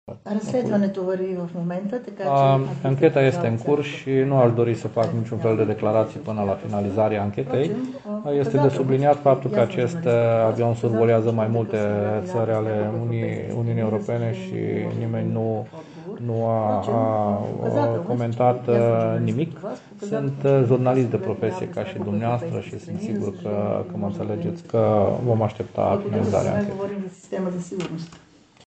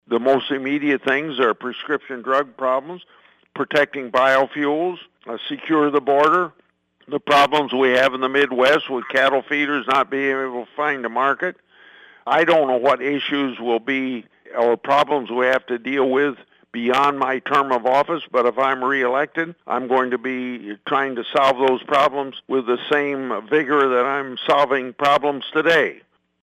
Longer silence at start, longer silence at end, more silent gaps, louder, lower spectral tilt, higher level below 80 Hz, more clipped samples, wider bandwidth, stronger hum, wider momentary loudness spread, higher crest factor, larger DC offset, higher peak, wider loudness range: about the same, 0.05 s vs 0.1 s; about the same, 0.5 s vs 0.5 s; neither; second, -23 LUFS vs -19 LUFS; first, -8.5 dB/octave vs -5 dB/octave; first, -60 dBFS vs -68 dBFS; neither; second, 8.4 kHz vs 15 kHz; neither; about the same, 10 LU vs 10 LU; about the same, 18 dB vs 14 dB; neither; about the same, -4 dBFS vs -6 dBFS; about the same, 5 LU vs 3 LU